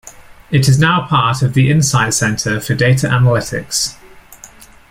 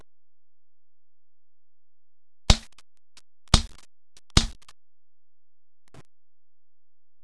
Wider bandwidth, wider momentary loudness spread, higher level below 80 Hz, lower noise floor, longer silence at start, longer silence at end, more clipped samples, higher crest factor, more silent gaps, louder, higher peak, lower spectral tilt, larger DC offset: first, 16 kHz vs 11 kHz; second, 6 LU vs 14 LU; second, -42 dBFS vs -34 dBFS; second, -40 dBFS vs under -90 dBFS; second, 0.05 s vs 2.5 s; second, 0.45 s vs 2.7 s; neither; second, 14 dB vs 30 dB; neither; first, -14 LUFS vs -25 LUFS; about the same, 0 dBFS vs 0 dBFS; about the same, -4.5 dB/octave vs -3.5 dB/octave; neither